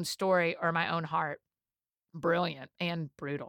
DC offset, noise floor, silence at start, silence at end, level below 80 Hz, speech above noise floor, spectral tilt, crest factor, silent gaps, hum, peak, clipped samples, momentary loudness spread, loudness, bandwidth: under 0.1%; under -90 dBFS; 0 s; 0 s; -74 dBFS; over 58 dB; -5 dB/octave; 18 dB; none; none; -16 dBFS; under 0.1%; 10 LU; -32 LUFS; 18.5 kHz